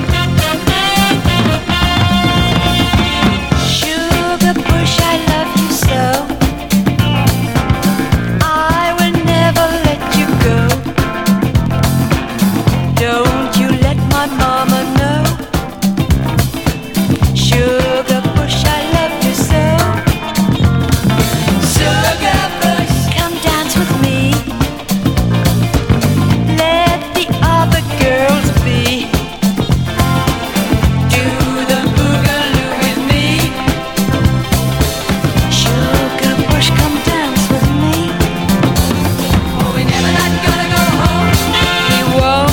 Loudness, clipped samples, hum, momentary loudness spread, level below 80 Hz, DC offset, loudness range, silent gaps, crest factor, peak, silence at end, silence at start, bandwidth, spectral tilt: -13 LUFS; under 0.1%; none; 4 LU; -24 dBFS; under 0.1%; 1 LU; none; 12 dB; 0 dBFS; 0 s; 0 s; 18 kHz; -5 dB/octave